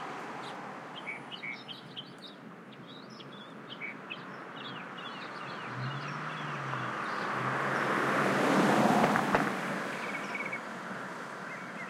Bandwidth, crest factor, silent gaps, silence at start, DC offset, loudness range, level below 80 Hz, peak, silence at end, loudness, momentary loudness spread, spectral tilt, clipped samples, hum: 16.5 kHz; 24 dB; none; 0 s; under 0.1%; 14 LU; -70 dBFS; -10 dBFS; 0 s; -33 LUFS; 20 LU; -5 dB/octave; under 0.1%; none